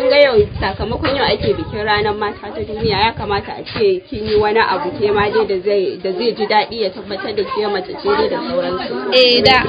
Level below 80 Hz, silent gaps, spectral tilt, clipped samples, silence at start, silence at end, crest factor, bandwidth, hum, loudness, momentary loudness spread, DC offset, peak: -36 dBFS; none; -6.5 dB/octave; under 0.1%; 0 s; 0 s; 16 dB; 8 kHz; none; -16 LUFS; 10 LU; under 0.1%; 0 dBFS